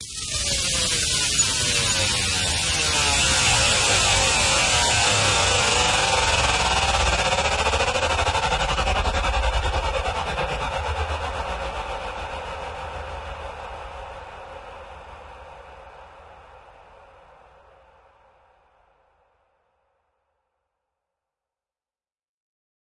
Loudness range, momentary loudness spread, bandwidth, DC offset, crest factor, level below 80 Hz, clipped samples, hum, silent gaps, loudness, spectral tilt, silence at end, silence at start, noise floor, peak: 19 LU; 19 LU; 11.5 kHz; under 0.1%; 18 dB; -34 dBFS; under 0.1%; none; none; -20 LUFS; -1.5 dB/octave; 6.4 s; 0 s; under -90 dBFS; -6 dBFS